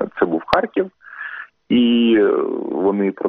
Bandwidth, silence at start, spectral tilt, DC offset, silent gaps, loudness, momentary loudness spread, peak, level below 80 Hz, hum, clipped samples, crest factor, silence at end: 5.8 kHz; 0 s; -4 dB/octave; under 0.1%; none; -18 LUFS; 16 LU; 0 dBFS; -52 dBFS; none; under 0.1%; 18 dB; 0 s